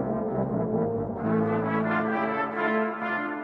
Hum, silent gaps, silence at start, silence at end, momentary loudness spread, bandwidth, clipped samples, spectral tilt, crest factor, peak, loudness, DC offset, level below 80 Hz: none; none; 0 s; 0 s; 3 LU; 5.2 kHz; under 0.1%; -9.5 dB/octave; 14 dB; -12 dBFS; -27 LUFS; under 0.1%; -56 dBFS